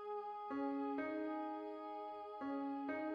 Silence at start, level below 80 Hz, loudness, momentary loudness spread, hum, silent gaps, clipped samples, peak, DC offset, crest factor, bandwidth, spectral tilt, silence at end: 0 s; -84 dBFS; -44 LUFS; 6 LU; none; none; under 0.1%; -30 dBFS; under 0.1%; 14 dB; 5.2 kHz; -7 dB/octave; 0 s